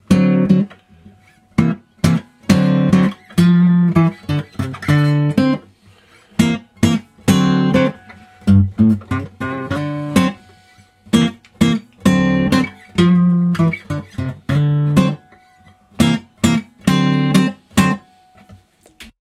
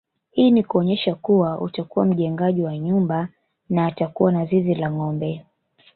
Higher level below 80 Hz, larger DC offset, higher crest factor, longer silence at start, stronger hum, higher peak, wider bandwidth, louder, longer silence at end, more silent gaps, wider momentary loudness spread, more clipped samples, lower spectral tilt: first, -42 dBFS vs -60 dBFS; neither; about the same, 16 dB vs 16 dB; second, 0.1 s vs 0.35 s; neither; first, 0 dBFS vs -4 dBFS; first, 15 kHz vs 4.4 kHz; first, -16 LUFS vs -21 LUFS; second, 0.25 s vs 0.55 s; neither; about the same, 10 LU vs 9 LU; neither; second, -6.5 dB/octave vs -12.5 dB/octave